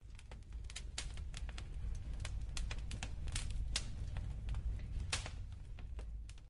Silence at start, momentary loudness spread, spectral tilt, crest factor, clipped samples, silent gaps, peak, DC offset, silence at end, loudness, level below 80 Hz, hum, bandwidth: 0 s; 10 LU; -3 dB/octave; 22 dB; under 0.1%; none; -20 dBFS; under 0.1%; 0 s; -46 LUFS; -44 dBFS; none; 11.5 kHz